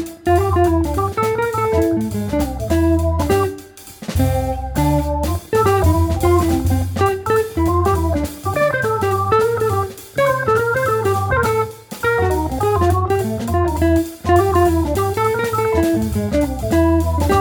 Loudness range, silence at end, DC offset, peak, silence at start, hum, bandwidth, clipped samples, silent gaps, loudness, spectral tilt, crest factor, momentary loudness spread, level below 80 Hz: 2 LU; 0 s; under 0.1%; -2 dBFS; 0 s; none; over 20 kHz; under 0.1%; none; -17 LUFS; -6.5 dB/octave; 14 dB; 6 LU; -28 dBFS